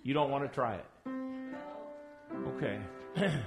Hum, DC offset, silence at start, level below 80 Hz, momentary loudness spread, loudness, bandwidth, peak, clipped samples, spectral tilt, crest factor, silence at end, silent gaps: none; under 0.1%; 0 s; -66 dBFS; 14 LU; -37 LUFS; 11.5 kHz; -18 dBFS; under 0.1%; -7 dB/octave; 18 dB; 0 s; none